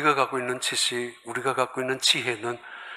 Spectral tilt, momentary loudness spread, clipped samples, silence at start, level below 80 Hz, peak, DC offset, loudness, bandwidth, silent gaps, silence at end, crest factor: -2 dB/octave; 11 LU; under 0.1%; 0 s; -78 dBFS; -6 dBFS; under 0.1%; -25 LUFS; 16 kHz; none; 0 s; 22 dB